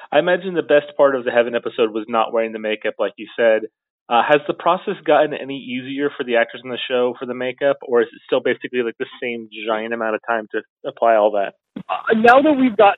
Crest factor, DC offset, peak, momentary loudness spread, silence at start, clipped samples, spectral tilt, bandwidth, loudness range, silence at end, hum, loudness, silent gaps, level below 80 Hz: 18 dB; under 0.1%; 0 dBFS; 12 LU; 0 s; under 0.1%; -6.5 dB/octave; 5.8 kHz; 4 LU; 0 s; none; -19 LUFS; 3.90-4.06 s, 10.70-10.77 s; -66 dBFS